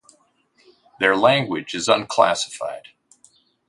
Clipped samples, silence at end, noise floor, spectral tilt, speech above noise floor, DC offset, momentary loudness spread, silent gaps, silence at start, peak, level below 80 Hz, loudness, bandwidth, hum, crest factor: under 0.1%; 0.9 s; -61 dBFS; -3.5 dB/octave; 42 dB; under 0.1%; 14 LU; none; 1 s; 0 dBFS; -64 dBFS; -20 LUFS; 11.5 kHz; none; 22 dB